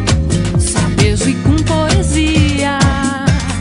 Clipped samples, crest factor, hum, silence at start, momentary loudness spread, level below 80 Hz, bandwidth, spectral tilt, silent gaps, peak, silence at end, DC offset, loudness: under 0.1%; 12 dB; none; 0 s; 2 LU; -20 dBFS; 11 kHz; -5 dB/octave; none; 0 dBFS; 0 s; under 0.1%; -13 LUFS